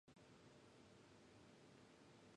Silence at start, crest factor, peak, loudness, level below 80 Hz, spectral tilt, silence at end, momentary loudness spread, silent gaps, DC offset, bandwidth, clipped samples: 0.05 s; 12 dB; -54 dBFS; -67 LUFS; -86 dBFS; -4.5 dB/octave; 0 s; 0 LU; none; under 0.1%; 10.5 kHz; under 0.1%